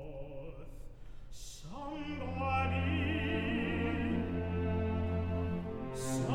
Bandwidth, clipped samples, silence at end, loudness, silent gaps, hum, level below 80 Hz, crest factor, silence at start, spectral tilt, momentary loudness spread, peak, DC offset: 14 kHz; under 0.1%; 0 s; -36 LUFS; none; none; -46 dBFS; 14 dB; 0 s; -6.5 dB/octave; 18 LU; -22 dBFS; under 0.1%